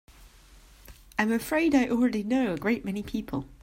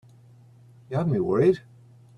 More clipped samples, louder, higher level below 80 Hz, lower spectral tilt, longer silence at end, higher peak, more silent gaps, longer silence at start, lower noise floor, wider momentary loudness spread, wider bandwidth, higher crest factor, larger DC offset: neither; second, -27 LUFS vs -24 LUFS; first, -52 dBFS vs -60 dBFS; second, -5.5 dB/octave vs -9.5 dB/octave; second, 0.1 s vs 0.6 s; about the same, -8 dBFS vs -10 dBFS; neither; second, 0.2 s vs 0.9 s; about the same, -54 dBFS vs -52 dBFS; about the same, 10 LU vs 10 LU; first, 16 kHz vs 6.6 kHz; about the same, 20 dB vs 18 dB; neither